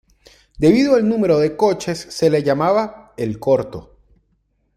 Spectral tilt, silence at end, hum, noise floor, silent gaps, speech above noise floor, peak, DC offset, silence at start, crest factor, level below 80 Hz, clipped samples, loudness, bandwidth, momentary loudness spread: -6.5 dB/octave; 0.95 s; none; -65 dBFS; none; 48 dB; -2 dBFS; under 0.1%; 0.6 s; 16 dB; -48 dBFS; under 0.1%; -17 LUFS; 14.5 kHz; 12 LU